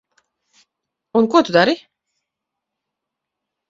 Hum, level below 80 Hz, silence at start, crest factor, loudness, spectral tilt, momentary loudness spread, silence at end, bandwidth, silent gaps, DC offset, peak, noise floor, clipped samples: none; -64 dBFS; 1.15 s; 22 dB; -16 LUFS; -5.5 dB/octave; 8 LU; 1.9 s; 7.8 kHz; none; under 0.1%; 0 dBFS; -82 dBFS; under 0.1%